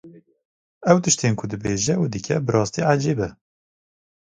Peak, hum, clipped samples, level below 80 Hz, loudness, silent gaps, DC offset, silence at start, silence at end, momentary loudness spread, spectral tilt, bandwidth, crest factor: 0 dBFS; none; under 0.1%; -52 dBFS; -21 LUFS; 0.45-0.81 s; under 0.1%; 0.05 s; 0.9 s; 9 LU; -5 dB/octave; 9.6 kHz; 22 dB